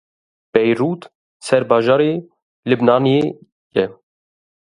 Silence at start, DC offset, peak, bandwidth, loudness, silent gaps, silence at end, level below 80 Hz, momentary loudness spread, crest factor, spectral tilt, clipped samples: 0.55 s; under 0.1%; 0 dBFS; 11 kHz; -17 LUFS; 1.15-1.40 s, 2.42-2.63 s, 3.52-3.71 s; 0.85 s; -62 dBFS; 13 LU; 18 dB; -6.5 dB/octave; under 0.1%